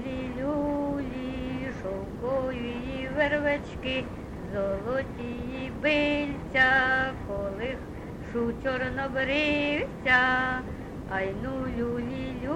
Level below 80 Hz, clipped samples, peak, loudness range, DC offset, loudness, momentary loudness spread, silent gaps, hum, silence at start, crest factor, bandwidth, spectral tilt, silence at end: -44 dBFS; under 0.1%; -10 dBFS; 4 LU; under 0.1%; -28 LUFS; 12 LU; none; none; 0 s; 20 dB; 12 kHz; -6 dB/octave; 0 s